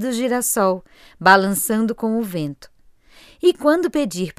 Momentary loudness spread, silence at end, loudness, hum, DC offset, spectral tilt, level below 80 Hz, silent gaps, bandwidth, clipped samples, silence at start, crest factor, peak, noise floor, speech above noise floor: 11 LU; 0.05 s; -18 LUFS; none; under 0.1%; -4 dB/octave; -56 dBFS; none; 16 kHz; under 0.1%; 0 s; 20 dB; 0 dBFS; -50 dBFS; 31 dB